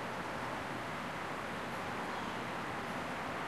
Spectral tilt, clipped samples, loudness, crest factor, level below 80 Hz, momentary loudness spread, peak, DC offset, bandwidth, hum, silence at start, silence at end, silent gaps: -4.5 dB/octave; under 0.1%; -40 LUFS; 12 dB; -64 dBFS; 1 LU; -28 dBFS; 0.1%; 13 kHz; none; 0 s; 0 s; none